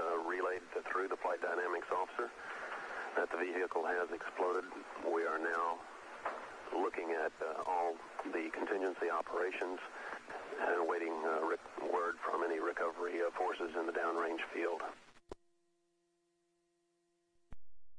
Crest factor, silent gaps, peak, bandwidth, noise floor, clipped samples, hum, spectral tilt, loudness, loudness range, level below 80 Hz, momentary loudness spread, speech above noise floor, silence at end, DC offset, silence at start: 18 dB; none; -22 dBFS; 11 kHz; -80 dBFS; under 0.1%; none; -3.5 dB/octave; -39 LUFS; 3 LU; -74 dBFS; 9 LU; 42 dB; 0 s; under 0.1%; 0 s